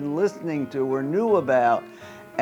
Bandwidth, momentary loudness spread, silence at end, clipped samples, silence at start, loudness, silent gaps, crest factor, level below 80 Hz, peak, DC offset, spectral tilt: 12 kHz; 13 LU; 0 s; under 0.1%; 0 s; -23 LUFS; none; 16 dB; -72 dBFS; -8 dBFS; under 0.1%; -7 dB/octave